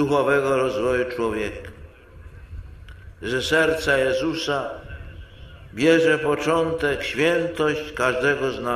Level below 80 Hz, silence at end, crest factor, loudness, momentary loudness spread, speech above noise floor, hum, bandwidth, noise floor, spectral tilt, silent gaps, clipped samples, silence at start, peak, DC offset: -44 dBFS; 0 s; 18 dB; -21 LUFS; 20 LU; 22 dB; none; 15 kHz; -44 dBFS; -5 dB/octave; none; under 0.1%; 0 s; -6 dBFS; under 0.1%